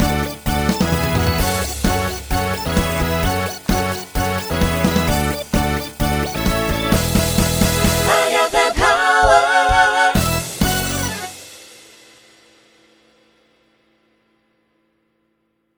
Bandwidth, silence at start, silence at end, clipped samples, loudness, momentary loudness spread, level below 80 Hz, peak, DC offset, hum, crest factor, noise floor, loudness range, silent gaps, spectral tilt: over 20 kHz; 0 s; 4.1 s; under 0.1%; -17 LUFS; 8 LU; -28 dBFS; 0 dBFS; under 0.1%; none; 18 dB; -67 dBFS; 7 LU; none; -4 dB/octave